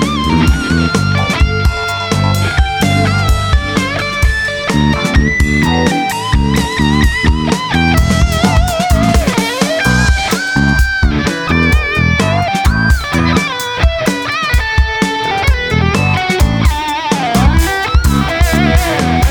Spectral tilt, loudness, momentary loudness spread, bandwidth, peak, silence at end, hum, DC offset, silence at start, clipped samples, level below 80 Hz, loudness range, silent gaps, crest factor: -5 dB/octave; -12 LUFS; 3 LU; 20 kHz; 0 dBFS; 0 s; none; under 0.1%; 0 s; under 0.1%; -16 dBFS; 1 LU; none; 12 dB